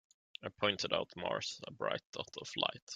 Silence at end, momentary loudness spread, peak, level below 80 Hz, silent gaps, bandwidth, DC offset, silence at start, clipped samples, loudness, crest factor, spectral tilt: 0 s; 12 LU; -14 dBFS; -76 dBFS; 2.05-2.13 s, 2.82-2.87 s; 9.4 kHz; under 0.1%; 0.4 s; under 0.1%; -38 LUFS; 24 dB; -3 dB/octave